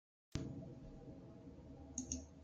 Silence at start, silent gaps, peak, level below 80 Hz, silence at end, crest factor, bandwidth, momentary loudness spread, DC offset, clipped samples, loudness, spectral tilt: 0.3 s; none; -24 dBFS; -62 dBFS; 0 s; 28 dB; 10 kHz; 12 LU; under 0.1%; under 0.1%; -51 LUFS; -4.5 dB/octave